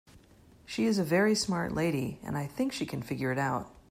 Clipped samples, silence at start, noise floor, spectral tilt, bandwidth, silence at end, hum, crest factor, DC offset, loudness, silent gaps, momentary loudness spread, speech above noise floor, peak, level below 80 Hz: under 0.1%; 0.15 s; -58 dBFS; -5 dB/octave; 16 kHz; 0.2 s; none; 16 dB; under 0.1%; -31 LUFS; none; 10 LU; 28 dB; -14 dBFS; -58 dBFS